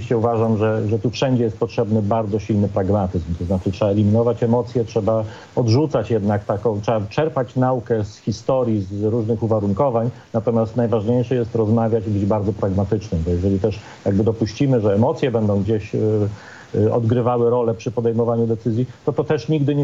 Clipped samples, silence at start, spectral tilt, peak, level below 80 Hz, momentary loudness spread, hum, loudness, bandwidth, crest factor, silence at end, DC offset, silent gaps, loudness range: under 0.1%; 0 s; -8.5 dB/octave; -4 dBFS; -48 dBFS; 5 LU; none; -20 LUFS; 7.6 kHz; 14 dB; 0 s; under 0.1%; none; 1 LU